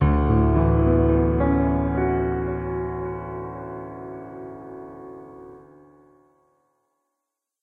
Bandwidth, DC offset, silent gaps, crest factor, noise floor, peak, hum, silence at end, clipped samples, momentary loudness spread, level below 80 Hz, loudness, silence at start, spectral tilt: 3.5 kHz; under 0.1%; none; 18 dB; -83 dBFS; -6 dBFS; none; 2.05 s; under 0.1%; 20 LU; -30 dBFS; -22 LUFS; 0 s; -12 dB/octave